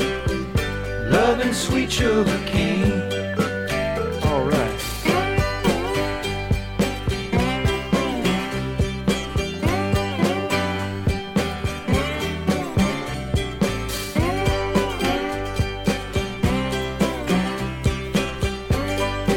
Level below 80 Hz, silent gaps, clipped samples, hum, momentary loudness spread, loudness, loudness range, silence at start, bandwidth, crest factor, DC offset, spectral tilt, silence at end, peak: -32 dBFS; none; under 0.1%; none; 5 LU; -23 LUFS; 3 LU; 0 s; 17.5 kHz; 16 dB; under 0.1%; -5.5 dB/octave; 0 s; -6 dBFS